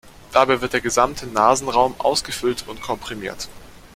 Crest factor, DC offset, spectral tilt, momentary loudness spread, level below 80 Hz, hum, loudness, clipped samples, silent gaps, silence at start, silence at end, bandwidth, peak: 20 dB; under 0.1%; -3 dB/octave; 12 LU; -46 dBFS; none; -20 LUFS; under 0.1%; none; 0.05 s; 0.1 s; 16.5 kHz; -2 dBFS